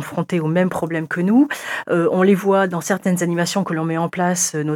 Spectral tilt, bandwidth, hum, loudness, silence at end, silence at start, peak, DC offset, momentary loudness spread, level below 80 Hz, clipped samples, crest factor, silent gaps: -5 dB/octave; 17.5 kHz; none; -19 LUFS; 0 s; 0 s; -4 dBFS; under 0.1%; 6 LU; -64 dBFS; under 0.1%; 14 dB; none